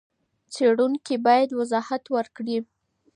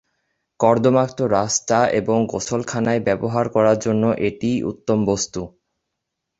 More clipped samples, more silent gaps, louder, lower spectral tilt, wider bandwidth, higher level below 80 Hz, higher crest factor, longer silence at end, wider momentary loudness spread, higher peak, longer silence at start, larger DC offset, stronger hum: neither; neither; second, -23 LUFS vs -19 LUFS; about the same, -4.5 dB/octave vs -5 dB/octave; first, 10.5 kHz vs 8 kHz; second, -76 dBFS vs -52 dBFS; about the same, 18 dB vs 18 dB; second, 0.5 s vs 0.9 s; first, 10 LU vs 7 LU; second, -6 dBFS vs -2 dBFS; about the same, 0.5 s vs 0.6 s; neither; neither